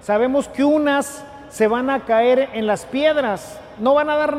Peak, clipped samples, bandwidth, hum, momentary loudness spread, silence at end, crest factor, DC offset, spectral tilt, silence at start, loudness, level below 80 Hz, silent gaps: -6 dBFS; under 0.1%; 15 kHz; none; 13 LU; 0 s; 12 dB; under 0.1%; -4.5 dB/octave; 0.05 s; -18 LUFS; -52 dBFS; none